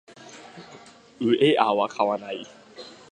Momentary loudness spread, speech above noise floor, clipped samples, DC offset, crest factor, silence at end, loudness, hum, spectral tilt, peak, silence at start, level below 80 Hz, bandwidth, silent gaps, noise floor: 25 LU; 26 dB; under 0.1%; under 0.1%; 22 dB; 0.2 s; -23 LUFS; none; -5.5 dB/octave; -4 dBFS; 0.2 s; -72 dBFS; 9.8 kHz; none; -49 dBFS